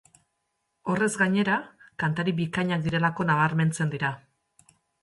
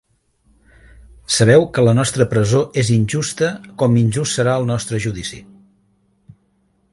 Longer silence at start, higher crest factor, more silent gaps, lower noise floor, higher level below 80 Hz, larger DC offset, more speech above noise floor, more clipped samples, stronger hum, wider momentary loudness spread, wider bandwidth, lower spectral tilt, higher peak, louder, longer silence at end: second, 0.85 s vs 1.3 s; about the same, 16 dB vs 18 dB; neither; first, -78 dBFS vs -62 dBFS; second, -62 dBFS vs -46 dBFS; neither; first, 53 dB vs 46 dB; neither; neither; about the same, 8 LU vs 10 LU; about the same, 11.5 kHz vs 11.5 kHz; about the same, -6 dB/octave vs -5.5 dB/octave; second, -10 dBFS vs 0 dBFS; second, -26 LUFS vs -16 LUFS; second, 0.85 s vs 1.5 s